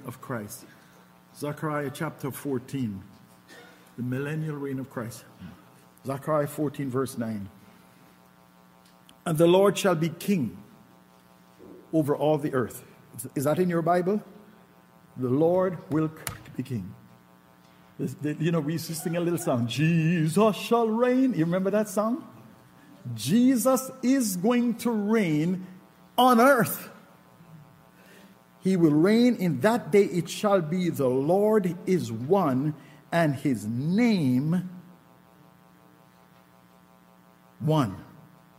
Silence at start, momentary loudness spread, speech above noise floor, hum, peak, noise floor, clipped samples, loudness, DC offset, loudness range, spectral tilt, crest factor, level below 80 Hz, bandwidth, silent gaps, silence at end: 0 s; 15 LU; 32 dB; none; -8 dBFS; -56 dBFS; under 0.1%; -26 LUFS; under 0.1%; 10 LU; -6 dB/octave; 18 dB; -68 dBFS; 16 kHz; none; 0.55 s